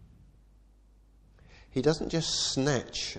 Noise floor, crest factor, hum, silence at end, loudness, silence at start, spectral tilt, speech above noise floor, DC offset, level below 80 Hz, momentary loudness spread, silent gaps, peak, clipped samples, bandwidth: -59 dBFS; 20 dB; none; 0 s; -29 LUFS; 0 s; -4 dB/octave; 30 dB; under 0.1%; -52 dBFS; 4 LU; none; -12 dBFS; under 0.1%; 10 kHz